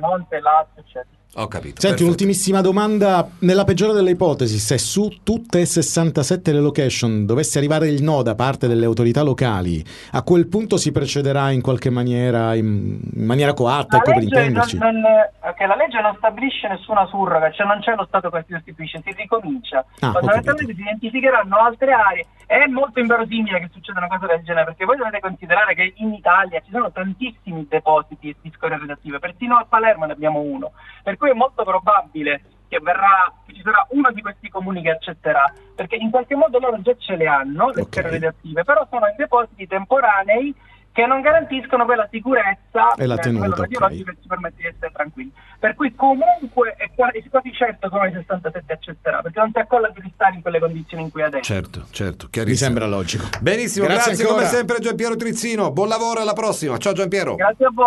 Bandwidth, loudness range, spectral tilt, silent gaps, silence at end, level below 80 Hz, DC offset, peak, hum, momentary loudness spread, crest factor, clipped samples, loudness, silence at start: 12 kHz; 4 LU; -5 dB/octave; none; 0 s; -48 dBFS; under 0.1%; 0 dBFS; none; 12 LU; 18 dB; under 0.1%; -18 LUFS; 0 s